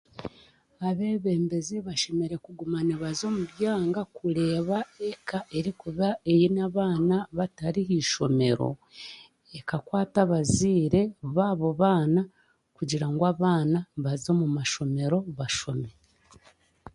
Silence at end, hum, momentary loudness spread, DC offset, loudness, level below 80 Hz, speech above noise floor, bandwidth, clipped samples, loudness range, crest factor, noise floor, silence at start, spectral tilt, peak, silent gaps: 0.05 s; none; 11 LU; under 0.1%; -27 LUFS; -56 dBFS; 33 dB; 11.5 kHz; under 0.1%; 4 LU; 20 dB; -60 dBFS; 0.15 s; -6 dB/octave; -8 dBFS; none